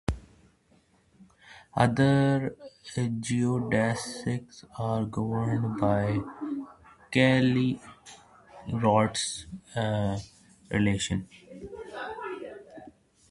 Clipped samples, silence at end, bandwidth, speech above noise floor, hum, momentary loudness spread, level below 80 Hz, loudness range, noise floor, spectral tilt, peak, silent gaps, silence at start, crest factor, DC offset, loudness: under 0.1%; 0.4 s; 11.5 kHz; 37 dB; none; 22 LU; -50 dBFS; 5 LU; -64 dBFS; -6 dB/octave; -6 dBFS; none; 0.1 s; 22 dB; under 0.1%; -28 LUFS